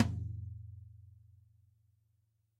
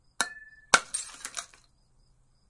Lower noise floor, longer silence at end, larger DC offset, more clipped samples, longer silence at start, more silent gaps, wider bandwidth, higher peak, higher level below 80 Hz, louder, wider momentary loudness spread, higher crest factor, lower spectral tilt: first, -76 dBFS vs -64 dBFS; first, 1.3 s vs 1.05 s; neither; neither; second, 0 s vs 0.2 s; neither; about the same, 10.5 kHz vs 11.5 kHz; second, -12 dBFS vs 0 dBFS; about the same, -60 dBFS vs -64 dBFS; second, -42 LUFS vs -29 LUFS; about the same, 23 LU vs 21 LU; about the same, 28 dB vs 32 dB; first, -7 dB/octave vs 0.5 dB/octave